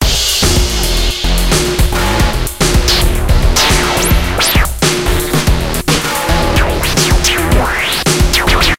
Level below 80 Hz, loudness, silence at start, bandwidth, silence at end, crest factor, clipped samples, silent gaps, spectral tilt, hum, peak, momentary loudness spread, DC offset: -16 dBFS; -12 LUFS; 0 s; 17 kHz; 0.05 s; 12 dB; under 0.1%; none; -3.5 dB/octave; none; 0 dBFS; 4 LU; under 0.1%